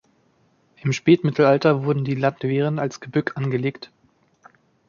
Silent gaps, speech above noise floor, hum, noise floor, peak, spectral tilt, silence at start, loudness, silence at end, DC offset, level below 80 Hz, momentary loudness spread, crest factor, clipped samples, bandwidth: none; 42 dB; none; -62 dBFS; -4 dBFS; -7 dB/octave; 0.85 s; -21 LUFS; 1.05 s; under 0.1%; -64 dBFS; 10 LU; 18 dB; under 0.1%; 7.2 kHz